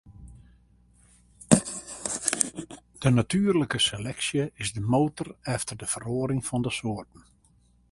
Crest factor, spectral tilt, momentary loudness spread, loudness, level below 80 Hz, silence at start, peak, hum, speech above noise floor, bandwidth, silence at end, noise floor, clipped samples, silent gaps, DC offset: 28 dB; -4 dB/octave; 11 LU; -27 LUFS; -52 dBFS; 0.05 s; -2 dBFS; 60 Hz at -50 dBFS; 35 dB; 12 kHz; 0.9 s; -62 dBFS; under 0.1%; none; under 0.1%